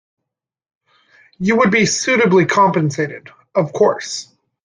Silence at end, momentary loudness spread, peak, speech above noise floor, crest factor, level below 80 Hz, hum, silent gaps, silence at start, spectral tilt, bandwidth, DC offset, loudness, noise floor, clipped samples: 0.4 s; 12 LU; -2 dBFS; 66 dB; 16 dB; -58 dBFS; none; none; 1.4 s; -4.5 dB/octave; 10.5 kHz; under 0.1%; -15 LUFS; -81 dBFS; under 0.1%